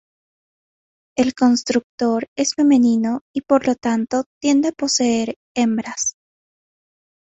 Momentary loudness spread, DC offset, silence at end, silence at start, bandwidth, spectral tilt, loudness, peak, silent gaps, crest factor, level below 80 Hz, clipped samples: 8 LU; under 0.1%; 1.1 s; 1.15 s; 8.2 kHz; -3.5 dB/octave; -19 LUFS; -4 dBFS; 1.84-1.98 s, 2.28-2.36 s, 3.21-3.34 s, 4.26-4.41 s, 5.36-5.55 s; 16 dB; -60 dBFS; under 0.1%